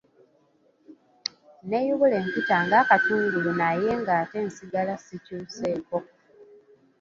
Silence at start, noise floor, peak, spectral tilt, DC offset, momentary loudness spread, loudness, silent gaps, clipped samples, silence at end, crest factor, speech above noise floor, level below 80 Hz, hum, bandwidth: 0.9 s; -64 dBFS; -4 dBFS; -5.5 dB/octave; under 0.1%; 15 LU; -25 LUFS; none; under 0.1%; 0.6 s; 22 dB; 39 dB; -66 dBFS; none; 7.6 kHz